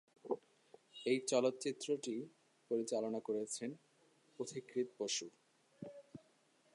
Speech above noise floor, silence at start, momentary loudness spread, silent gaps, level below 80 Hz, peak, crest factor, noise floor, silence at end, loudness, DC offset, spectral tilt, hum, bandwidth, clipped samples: 34 dB; 0.25 s; 20 LU; none; under -90 dBFS; -20 dBFS; 22 dB; -73 dBFS; 0.6 s; -41 LUFS; under 0.1%; -3.5 dB/octave; none; 11.5 kHz; under 0.1%